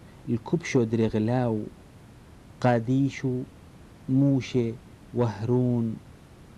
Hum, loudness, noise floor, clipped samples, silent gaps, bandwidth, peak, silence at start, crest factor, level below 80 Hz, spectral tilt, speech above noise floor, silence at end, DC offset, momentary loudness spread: none; -26 LUFS; -49 dBFS; under 0.1%; none; 10.5 kHz; -8 dBFS; 0 s; 18 dB; -54 dBFS; -8 dB/octave; 24 dB; 0.15 s; under 0.1%; 12 LU